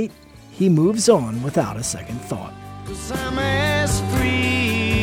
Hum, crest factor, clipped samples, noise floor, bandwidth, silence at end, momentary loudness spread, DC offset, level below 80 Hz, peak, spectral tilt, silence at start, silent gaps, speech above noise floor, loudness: none; 20 dB; under 0.1%; -43 dBFS; 16.5 kHz; 0 s; 14 LU; under 0.1%; -36 dBFS; -2 dBFS; -5 dB/octave; 0 s; none; 23 dB; -20 LUFS